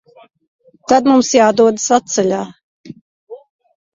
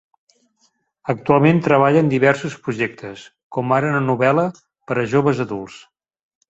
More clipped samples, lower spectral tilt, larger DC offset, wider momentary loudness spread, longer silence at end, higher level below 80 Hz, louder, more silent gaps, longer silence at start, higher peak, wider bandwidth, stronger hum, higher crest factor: neither; second, -3.5 dB/octave vs -7.5 dB/octave; neither; second, 13 LU vs 16 LU; second, 0.55 s vs 0.7 s; about the same, -58 dBFS vs -58 dBFS; first, -13 LUFS vs -18 LUFS; first, 2.63-2.84 s, 3.01-3.27 s vs 3.43-3.50 s; second, 0.9 s vs 1.05 s; about the same, 0 dBFS vs -2 dBFS; about the same, 7.8 kHz vs 8 kHz; neither; about the same, 16 dB vs 18 dB